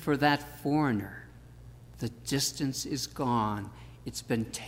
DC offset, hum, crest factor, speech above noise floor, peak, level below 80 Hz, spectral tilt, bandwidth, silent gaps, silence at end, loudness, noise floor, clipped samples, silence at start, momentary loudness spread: under 0.1%; none; 20 dB; 19 dB; -12 dBFS; -54 dBFS; -4.5 dB/octave; 16 kHz; none; 0 s; -31 LUFS; -50 dBFS; under 0.1%; 0 s; 23 LU